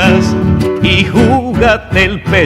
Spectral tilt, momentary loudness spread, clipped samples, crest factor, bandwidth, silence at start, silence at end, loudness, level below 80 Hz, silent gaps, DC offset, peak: -6 dB/octave; 3 LU; 0.4%; 10 dB; 14.5 kHz; 0 s; 0 s; -10 LUFS; -24 dBFS; none; under 0.1%; 0 dBFS